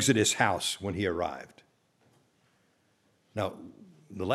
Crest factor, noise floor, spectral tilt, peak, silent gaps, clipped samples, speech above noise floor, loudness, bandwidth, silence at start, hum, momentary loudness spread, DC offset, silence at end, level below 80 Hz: 24 dB; -70 dBFS; -3.5 dB/octave; -8 dBFS; none; under 0.1%; 40 dB; -30 LUFS; 16 kHz; 0 s; none; 24 LU; under 0.1%; 0 s; -62 dBFS